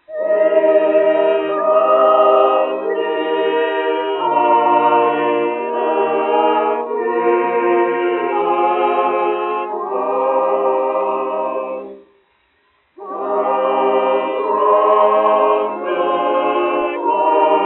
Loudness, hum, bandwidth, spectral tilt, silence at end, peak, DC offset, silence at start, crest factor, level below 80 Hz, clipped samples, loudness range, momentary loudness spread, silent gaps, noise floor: -16 LUFS; none; 4.1 kHz; -2 dB/octave; 0 s; 0 dBFS; under 0.1%; 0.1 s; 14 dB; -68 dBFS; under 0.1%; 6 LU; 7 LU; none; -60 dBFS